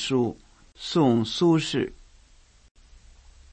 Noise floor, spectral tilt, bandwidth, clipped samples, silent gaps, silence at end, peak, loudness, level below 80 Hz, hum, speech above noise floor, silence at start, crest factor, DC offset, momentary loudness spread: -56 dBFS; -6 dB/octave; 8.6 kHz; under 0.1%; none; 1.6 s; -8 dBFS; -24 LUFS; -54 dBFS; none; 33 dB; 0 s; 18 dB; under 0.1%; 10 LU